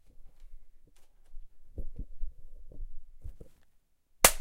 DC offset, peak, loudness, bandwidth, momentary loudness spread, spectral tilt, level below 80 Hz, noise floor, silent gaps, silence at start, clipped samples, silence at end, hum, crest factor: under 0.1%; -2 dBFS; -24 LUFS; 16 kHz; 28 LU; -1 dB/octave; -42 dBFS; -65 dBFS; none; 0.05 s; under 0.1%; 0 s; none; 34 dB